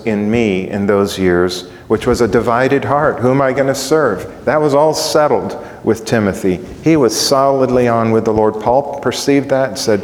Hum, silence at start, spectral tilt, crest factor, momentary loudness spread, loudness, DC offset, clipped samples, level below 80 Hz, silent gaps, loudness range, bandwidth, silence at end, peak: none; 0 s; -5 dB/octave; 14 dB; 6 LU; -14 LUFS; under 0.1%; under 0.1%; -40 dBFS; none; 1 LU; 18.5 kHz; 0 s; 0 dBFS